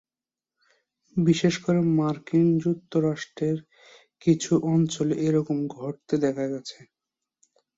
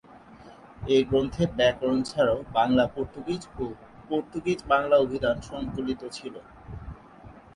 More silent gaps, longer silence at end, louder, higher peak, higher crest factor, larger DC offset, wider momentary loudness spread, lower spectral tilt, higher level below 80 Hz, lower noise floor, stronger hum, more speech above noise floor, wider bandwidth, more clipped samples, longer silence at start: neither; first, 1.05 s vs 0.15 s; about the same, -25 LUFS vs -26 LUFS; about the same, -8 dBFS vs -8 dBFS; about the same, 18 dB vs 20 dB; neither; second, 10 LU vs 20 LU; about the same, -6.5 dB/octave vs -6 dB/octave; second, -64 dBFS vs -48 dBFS; first, under -90 dBFS vs -49 dBFS; neither; first, over 66 dB vs 23 dB; second, 8 kHz vs 11.5 kHz; neither; first, 1.15 s vs 0.15 s